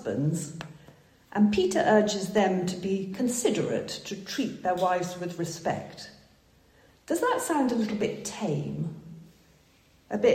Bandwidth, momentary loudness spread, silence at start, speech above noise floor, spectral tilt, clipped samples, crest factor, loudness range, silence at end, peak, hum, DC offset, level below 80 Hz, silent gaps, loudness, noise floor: 16 kHz; 13 LU; 0 s; 34 dB; -5 dB/octave; under 0.1%; 20 dB; 5 LU; 0 s; -10 dBFS; none; under 0.1%; -62 dBFS; none; -28 LUFS; -61 dBFS